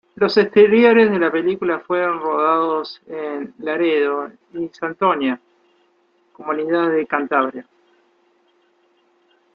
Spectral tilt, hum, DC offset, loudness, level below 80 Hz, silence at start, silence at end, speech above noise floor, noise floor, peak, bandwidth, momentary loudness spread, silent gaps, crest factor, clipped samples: -7 dB/octave; none; under 0.1%; -18 LUFS; -66 dBFS; 0.2 s; 1.9 s; 43 dB; -61 dBFS; -2 dBFS; 6.8 kHz; 16 LU; none; 18 dB; under 0.1%